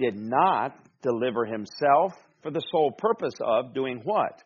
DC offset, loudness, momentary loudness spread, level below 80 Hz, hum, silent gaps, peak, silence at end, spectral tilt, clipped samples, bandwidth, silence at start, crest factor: under 0.1%; -26 LUFS; 10 LU; -72 dBFS; none; none; -8 dBFS; 0.1 s; -4 dB/octave; under 0.1%; 7 kHz; 0 s; 18 dB